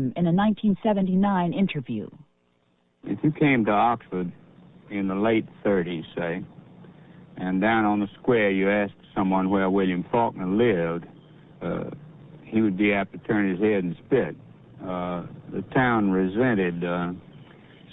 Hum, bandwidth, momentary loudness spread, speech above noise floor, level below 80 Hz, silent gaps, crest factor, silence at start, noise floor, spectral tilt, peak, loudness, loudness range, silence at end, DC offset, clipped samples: none; 4 kHz; 13 LU; 43 dB; -56 dBFS; none; 16 dB; 0 s; -67 dBFS; -11 dB/octave; -8 dBFS; -24 LUFS; 3 LU; 0.5 s; under 0.1%; under 0.1%